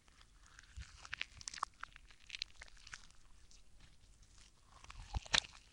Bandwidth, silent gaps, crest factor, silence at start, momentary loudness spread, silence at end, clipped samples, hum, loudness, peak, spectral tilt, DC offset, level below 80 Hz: 16.5 kHz; none; 36 dB; 0.05 s; 29 LU; 0 s; under 0.1%; none; -43 LUFS; -12 dBFS; -1 dB/octave; under 0.1%; -58 dBFS